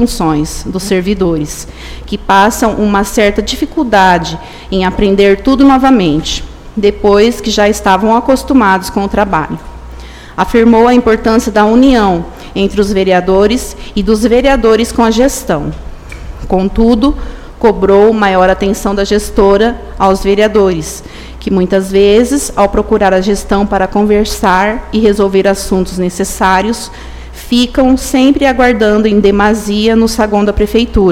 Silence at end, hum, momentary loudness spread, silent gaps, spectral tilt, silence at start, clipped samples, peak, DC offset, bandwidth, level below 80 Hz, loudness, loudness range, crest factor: 0 s; none; 13 LU; none; -5 dB/octave; 0 s; 0.8%; 0 dBFS; under 0.1%; 16.5 kHz; -24 dBFS; -10 LUFS; 2 LU; 10 dB